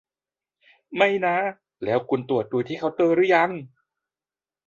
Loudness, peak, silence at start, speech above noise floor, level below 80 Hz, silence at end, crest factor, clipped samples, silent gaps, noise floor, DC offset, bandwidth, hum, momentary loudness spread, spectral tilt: -23 LUFS; -4 dBFS; 0.9 s; over 68 dB; -68 dBFS; 1 s; 20 dB; under 0.1%; none; under -90 dBFS; under 0.1%; 7.4 kHz; none; 12 LU; -7 dB/octave